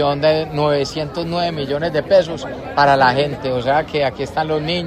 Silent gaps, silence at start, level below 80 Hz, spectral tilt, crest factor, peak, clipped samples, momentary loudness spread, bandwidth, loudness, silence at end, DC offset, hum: none; 0 s; -44 dBFS; -6 dB/octave; 16 dB; 0 dBFS; under 0.1%; 8 LU; 13.5 kHz; -18 LUFS; 0 s; under 0.1%; none